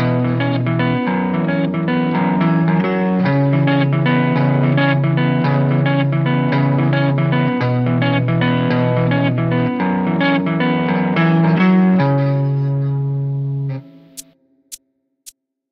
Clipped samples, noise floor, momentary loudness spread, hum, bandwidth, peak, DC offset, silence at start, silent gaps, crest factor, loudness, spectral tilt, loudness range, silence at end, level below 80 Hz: under 0.1%; -62 dBFS; 6 LU; none; 11 kHz; -4 dBFS; under 0.1%; 0 s; none; 12 dB; -16 LUFS; -8 dB/octave; 2 LU; 0.4 s; -54 dBFS